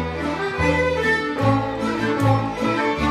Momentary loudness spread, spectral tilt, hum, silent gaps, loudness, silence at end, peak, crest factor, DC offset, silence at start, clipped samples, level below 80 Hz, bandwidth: 5 LU; -6.5 dB/octave; none; none; -21 LUFS; 0 s; -6 dBFS; 16 dB; under 0.1%; 0 s; under 0.1%; -38 dBFS; 13.5 kHz